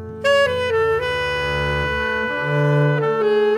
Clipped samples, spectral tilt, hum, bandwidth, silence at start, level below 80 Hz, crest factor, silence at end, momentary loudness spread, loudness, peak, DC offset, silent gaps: under 0.1%; -6 dB/octave; none; 12 kHz; 0 s; -38 dBFS; 14 dB; 0 s; 4 LU; -19 LUFS; -6 dBFS; under 0.1%; none